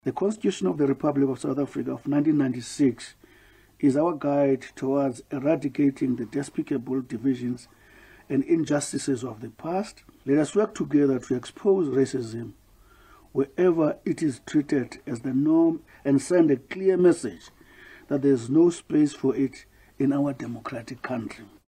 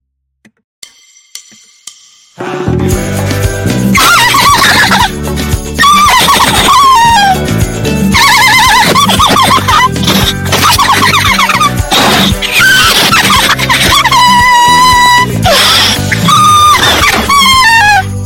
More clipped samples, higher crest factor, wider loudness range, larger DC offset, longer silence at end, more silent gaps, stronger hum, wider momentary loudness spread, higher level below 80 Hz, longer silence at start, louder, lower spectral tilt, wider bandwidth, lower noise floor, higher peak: second, under 0.1% vs 0.4%; first, 16 dB vs 6 dB; about the same, 4 LU vs 5 LU; neither; first, 0.25 s vs 0 s; neither; neither; first, 12 LU vs 8 LU; second, -62 dBFS vs -24 dBFS; second, 0.05 s vs 1.35 s; second, -25 LUFS vs -5 LUFS; first, -6.5 dB/octave vs -2.5 dB/octave; second, 11.5 kHz vs over 20 kHz; first, -55 dBFS vs -48 dBFS; second, -8 dBFS vs 0 dBFS